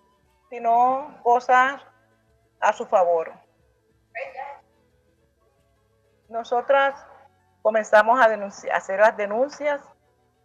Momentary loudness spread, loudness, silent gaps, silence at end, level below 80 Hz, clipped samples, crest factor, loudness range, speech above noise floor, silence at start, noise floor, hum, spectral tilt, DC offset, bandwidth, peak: 18 LU; -21 LUFS; none; 0.65 s; -72 dBFS; under 0.1%; 20 dB; 9 LU; 44 dB; 0.5 s; -64 dBFS; none; -3.5 dB/octave; under 0.1%; 8.6 kHz; -4 dBFS